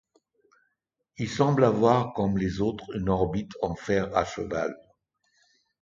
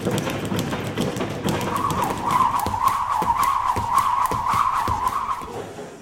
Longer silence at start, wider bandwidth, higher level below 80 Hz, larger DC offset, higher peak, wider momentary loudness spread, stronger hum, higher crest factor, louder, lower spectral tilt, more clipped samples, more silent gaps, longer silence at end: first, 1.2 s vs 0 s; second, 7.6 kHz vs 17 kHz; second, -50 dBFS vs -44 dBFS; neither; second, -8 dBFS vs -4 dBFS; first, 11 LU vs 6 LU; neither; about the same, 20 dB vs 18 dB; second, -26 LUFS vs -22 LUFS; first, -7 dB/octave vs -4.5 dB/octave; neither; neither; first, 1.05 s vs 0 s